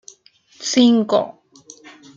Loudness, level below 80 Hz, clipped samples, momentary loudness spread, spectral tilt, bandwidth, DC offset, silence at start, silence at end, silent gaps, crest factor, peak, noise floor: -17 LUFS; -68 dBFS; under 0.1%; 15 LU; -4 dB/octave; 7.6 kHz; under 0.1%; 0.6 s; 0.85 s; none; 18 dB; -2 dBFS; -52 dBFS